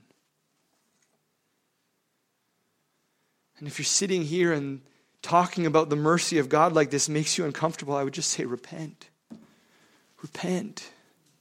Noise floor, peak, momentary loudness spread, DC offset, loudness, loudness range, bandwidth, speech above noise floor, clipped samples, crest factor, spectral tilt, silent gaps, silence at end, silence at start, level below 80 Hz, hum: -75 dBFS; -6 dBFS; 19 LU; under 0.1%; -25 LUFS; 9 LU; 16.5 kHz; 49 dB; under 0.1%; 22 dB; -4 dB/octave; none; 0.5 s; 3.6 s; -74 dBFS; none